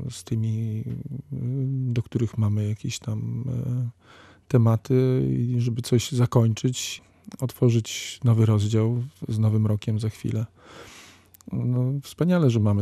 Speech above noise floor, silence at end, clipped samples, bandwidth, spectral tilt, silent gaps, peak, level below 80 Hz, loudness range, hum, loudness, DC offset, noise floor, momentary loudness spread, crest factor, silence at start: 27 dB; 0 s; under 0.1%; 14 kHz; -7 dB/octave; none; -6 dBFS; -56 dBFS; 4 LU; none; -25 LUFS; under 0.1%; -50 dBFS; 12 LU; 18 dB; 0 s